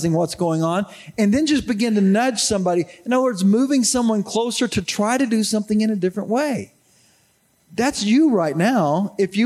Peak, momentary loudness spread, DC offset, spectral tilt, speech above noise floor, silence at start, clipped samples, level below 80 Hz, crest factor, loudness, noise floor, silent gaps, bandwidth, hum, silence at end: -6 dBFS; 6 LU; under 0.1%; -5 dB/octave; 42 dB; 0 s; under 0.1%; -52 dBFS; 12 dB; -19 LUFS; -61 dBFS; none; 13.5 kHz; none; 0 s